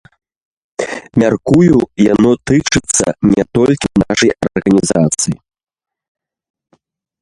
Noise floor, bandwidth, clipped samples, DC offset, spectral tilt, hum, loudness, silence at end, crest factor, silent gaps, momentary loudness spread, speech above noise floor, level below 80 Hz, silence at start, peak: -59 dBFS; 11.5 kHz; under 0.1%; under 0.1%; -5 dB/octave; none; -13 LUFS; 1.9 s; 14 dB; none; 9 LU; 47 dB; -40 dBFS; 0.8 s; 0 dBFS